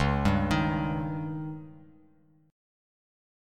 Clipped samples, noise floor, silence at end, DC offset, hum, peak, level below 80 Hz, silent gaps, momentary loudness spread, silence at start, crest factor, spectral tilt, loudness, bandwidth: under 0.1%; -62 dBFS; 1.65 s; under 0.1%; none; -10 dBFS; -42 dBFS; none; 16 LU; 0 s; 20 dB; -7 dB/octave; -29 LUFS; 13 kHz